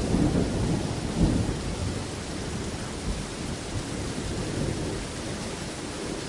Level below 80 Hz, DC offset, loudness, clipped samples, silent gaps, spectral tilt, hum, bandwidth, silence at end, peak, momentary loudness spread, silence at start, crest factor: -38 dBFS; under 0.1%; -30 LUFS; under 0.1%; none; -5.5 dB/octave; none; 11.5 kHz; 0 s; -10 dBFS; 8 LU; 0 s; 18 dB